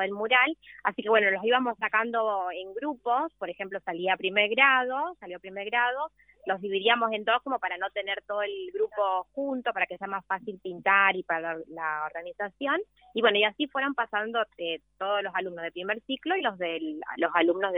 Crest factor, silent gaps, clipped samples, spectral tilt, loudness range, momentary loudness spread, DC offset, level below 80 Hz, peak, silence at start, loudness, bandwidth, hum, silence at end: 20 dB; none; under 0.1%; -7 dB/octave; 4 LU; 12 LU; under 0.1%; -72 dBFS; -8 dBFS; 0 s; -27 LUFS; 4 kHz; none; 0 s